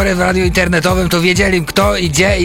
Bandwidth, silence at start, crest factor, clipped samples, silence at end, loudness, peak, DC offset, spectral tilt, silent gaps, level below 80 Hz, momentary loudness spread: 16.5 kHz; 0 s; 12 dB; under 0.1%; 0 s; -12 LUFS; -2 dBFS; under 0.1%; -4.5 dB/octave; none; -24 dBFS; 2 LU